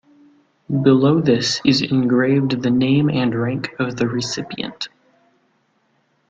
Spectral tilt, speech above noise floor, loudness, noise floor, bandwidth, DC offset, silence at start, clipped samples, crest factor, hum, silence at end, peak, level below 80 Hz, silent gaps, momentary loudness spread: -6 dB/octave; 46 dB; -18 LUFS; -64 dBFS; 7.8 kHz; under 0.1%; 0.7 s; under 0.1%; 18 dB; none; 1.4 s; -2 dBFS; -56 dBFS; none; 12 LU